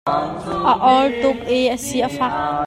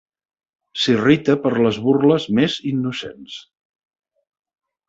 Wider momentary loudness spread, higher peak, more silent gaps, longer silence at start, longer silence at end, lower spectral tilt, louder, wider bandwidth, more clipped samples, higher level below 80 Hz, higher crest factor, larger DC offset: second, 8 LU vs 17 LU; about the same, -2 dBFS vs -2 dBFS; neither; second, 0.05 s vs 0.75 s; second, 0 s vs 1.45 s; second, -4.5 dB/octave vs -6 dB/octave; about the same, -18 LUFS vs -18 LUFS; first, 16 kHz vs 8 kHz; neither; first, -46 dBFS vs -58 dBFS; about the same, 16 dB vs 18 dB; neither